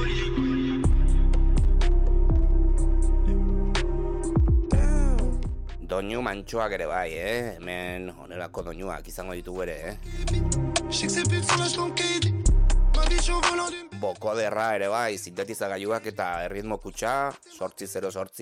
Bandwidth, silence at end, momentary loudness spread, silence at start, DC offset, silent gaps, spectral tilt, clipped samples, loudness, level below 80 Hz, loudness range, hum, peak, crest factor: 12.5 kHz; 0 s; 11 LU; 0 s; under 0.1%; none; -5 dB/octave; under 0.1%; -27 LUFS; -24 dBFS; 7 LU; none; -8 dBFS; 16 dB